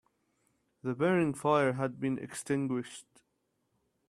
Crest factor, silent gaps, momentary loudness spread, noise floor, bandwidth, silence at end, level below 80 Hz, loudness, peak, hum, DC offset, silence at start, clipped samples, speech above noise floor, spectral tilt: 20 dB; none; 12 LU; -79 dBFS; 14 kHz; 1.1 s; -72 dBFS; -32 LUFS; -14 dBFS; none; under 0.1%; 0.85 s; under 0.1%; 48 dB; -6 dB/octave